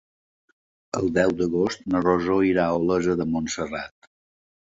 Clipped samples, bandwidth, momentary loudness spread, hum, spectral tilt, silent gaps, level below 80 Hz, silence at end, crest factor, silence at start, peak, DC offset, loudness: under 0.1%; 8 kHz; 10 LU; none; -6 dB/octave; none; -50 dBFS; 0.9 s; 20 dB; 0.95 s; -6 dBFS; under 0.1%; -23 LUFS